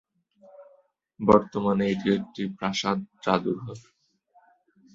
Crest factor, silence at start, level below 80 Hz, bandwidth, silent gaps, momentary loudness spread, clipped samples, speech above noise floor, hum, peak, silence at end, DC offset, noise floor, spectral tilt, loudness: 24 dB; 0.6 s; -58 dBFS; 7.6 kHz; none; 13 LU; under 0.1%; 38 dB; none; -2 dBFS; 1.15 s; under 0.1%; -63 dBFS; -6 dB/octave; -25 LUFS